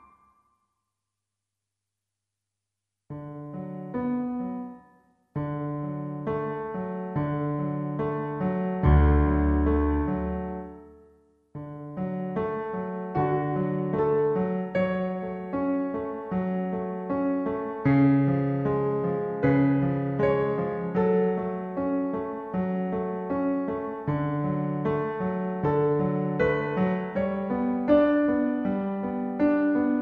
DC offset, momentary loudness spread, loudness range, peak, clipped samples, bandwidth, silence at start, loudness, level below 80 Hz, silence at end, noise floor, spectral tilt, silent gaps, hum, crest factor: under 0.1%; 10 LU; 9 LU; -10 dBFS; under 0.1%; 4.8 kHz; 3.1 s; -27 LUFS; -38 dBFS; 0 s; -86 dBFS; -11 dB/octave; none; none; 18 dB